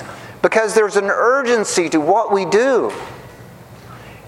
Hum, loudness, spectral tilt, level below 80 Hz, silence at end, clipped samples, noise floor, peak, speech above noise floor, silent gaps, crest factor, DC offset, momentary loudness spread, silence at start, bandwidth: none; -16 LUFS; -3.5 dB/octave; -56 dBFS; 0 s; under 0.1%; -39 dBFS; 0 dBFS; 23 dB; none; 18 dB; under 0.1%; 16 LU; 0 s; 15.5 kHz